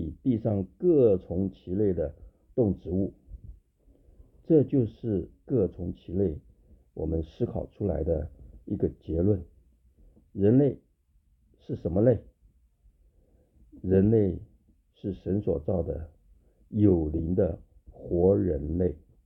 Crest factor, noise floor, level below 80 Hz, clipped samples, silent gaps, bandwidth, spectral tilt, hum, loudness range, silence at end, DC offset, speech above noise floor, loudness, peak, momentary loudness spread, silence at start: 20 dB; -66 dBFS; -46 dBFS; under 0.1%; none; 4 kHz; -12.5 dB/octave; none; 4 LU; 0.3 s; under 0.1%; 40 dB; -28 LUFS; -8 dBFS; 15 LU; 0 s